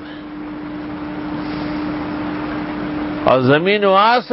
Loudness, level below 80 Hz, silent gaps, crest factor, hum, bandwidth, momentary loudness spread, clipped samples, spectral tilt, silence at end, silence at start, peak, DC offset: -18 LUFS; -44 dBFS; none; 18 dB; none; 5.8 kHz; 15 LU; under 0.1%; -9.5 dB/octave; 0 s; 0 s; 0 dBFS; under 0.1%